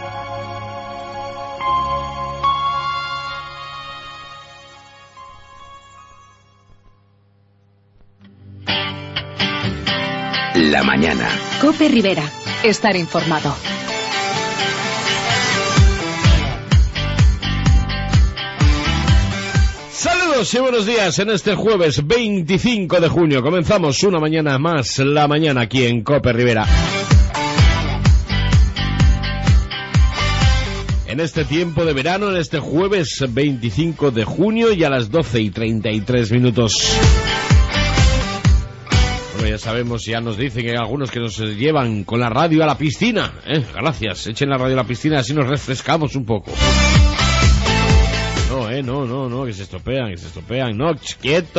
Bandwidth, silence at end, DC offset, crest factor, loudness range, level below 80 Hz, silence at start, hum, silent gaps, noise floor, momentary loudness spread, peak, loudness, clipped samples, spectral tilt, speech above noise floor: 8 kHz; 0 s; under 0.1%; 14 dB; 7 LU; -24 dBFS; 0 s; none; none; -55 dBFS; 9 LU; -2 dBFS; -17 LUFS; under 0.1%; -5 dB/octave; 38 dB